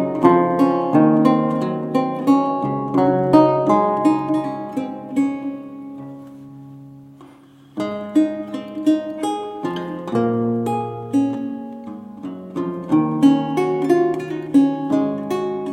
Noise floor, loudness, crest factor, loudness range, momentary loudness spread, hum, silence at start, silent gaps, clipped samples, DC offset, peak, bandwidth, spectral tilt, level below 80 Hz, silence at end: -46 dBFS; -19 LUFS; 18 dB; 10 LU; 18 LU; none; 0 s; none; under 0.1%; under 0.1%; 0 dBFS; 12 kHz; -8 dB/octave; -60 dBFS; 0 s